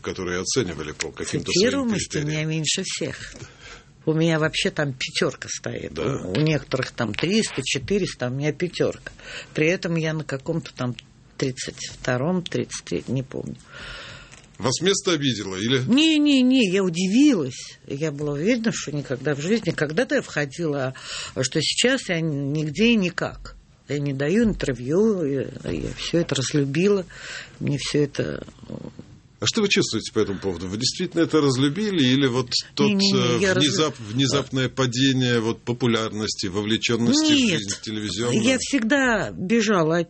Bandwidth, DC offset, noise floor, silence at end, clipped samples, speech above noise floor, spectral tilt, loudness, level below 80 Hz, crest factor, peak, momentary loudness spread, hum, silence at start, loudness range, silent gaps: 8.8 kHz; under 0.1%; -44 dBFS; 0 s; under 0.1%; 21 dB; -4.5 dB/octave; -23 LUFS; -50 dBFS; 18 dB; -4 dBFS; 12 LU; none; 0.05 s; 6 LU; none